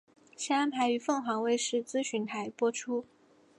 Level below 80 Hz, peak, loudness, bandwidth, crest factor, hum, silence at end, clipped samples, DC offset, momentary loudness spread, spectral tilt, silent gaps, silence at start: -86 dBFS; -16 dBFS; -32 LUFS; 11.5 kHz; 16 dB; none; 0.55 s; under 0.1%; under 0.1%; 7 LU; -3 dB/octave; none; 0.4 s